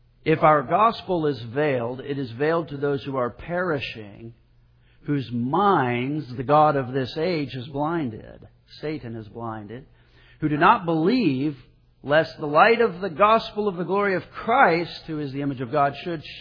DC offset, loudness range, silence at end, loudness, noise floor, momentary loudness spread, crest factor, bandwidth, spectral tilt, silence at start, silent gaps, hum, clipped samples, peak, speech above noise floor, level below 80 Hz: under 0.1%; 7 LU; 0 s; -23 LUFS; -57 dBFS; 15 LU; 20 dB; 5.4 kHz; -8.5 dB/octave; 0.25 s; none; none; under 0.1%; -2 dBFS; 34 dB; -54 dBFS